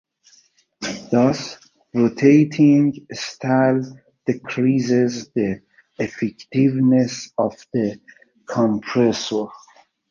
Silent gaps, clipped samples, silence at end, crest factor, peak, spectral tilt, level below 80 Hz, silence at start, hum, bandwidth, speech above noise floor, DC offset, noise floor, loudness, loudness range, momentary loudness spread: none; under 0.1%; 0.55 s; 18 dB; -2 dBFS; -6.5 dB/octave; -60 dBFS; 0.8 s; none; 7.4 kHz; 38 dB; under 0.1%; -57 dBFS; -20 LUFS; 4 LU; 14 LU